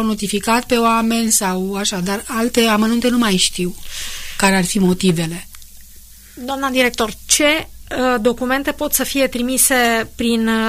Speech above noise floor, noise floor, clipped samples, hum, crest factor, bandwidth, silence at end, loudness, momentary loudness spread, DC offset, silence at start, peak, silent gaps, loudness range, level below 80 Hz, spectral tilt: 23 dB; -40 dBFS; under 0.1%; none; 16 dB; 15.5 kHz; 0 s; -16 LUFS; 11 LU; under 0.1%; 0 s; -2 dBFS; none; 3 LU; -38 dBFS; -3.5 dB/octave